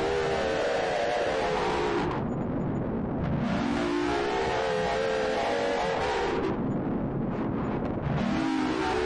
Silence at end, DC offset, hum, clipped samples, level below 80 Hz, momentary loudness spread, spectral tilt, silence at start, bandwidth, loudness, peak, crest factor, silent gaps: 0 s; under 0.1%; none; under 0.1%; -46 dBFS; 3 LU; -6 dB/octave; 0 s; 11 kHz; -28 LUFS; -20 dBFS; 8 dB; none